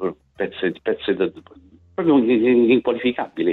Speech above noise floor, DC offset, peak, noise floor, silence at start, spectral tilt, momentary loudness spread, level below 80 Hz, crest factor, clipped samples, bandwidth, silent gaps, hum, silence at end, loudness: 31 dB; under 0.1%; -6 dBFS; -49 dBFS; 0 s; -9 dB/octave; 13 LU; -58 dBFS; 14 dB; under 0.1%; 4.2 kHz; none; none; 0 s; -20 LUFS